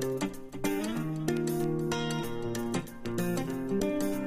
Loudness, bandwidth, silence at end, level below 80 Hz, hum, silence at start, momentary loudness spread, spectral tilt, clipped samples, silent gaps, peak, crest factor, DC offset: -32 LUFS; 15.5 kHz; 0 s; -50 dBFS; none; 0 s; 5 LU; -5.5 dB/octave; under 0.1%; none; -14 dBFS; 16 dB; under 0.1%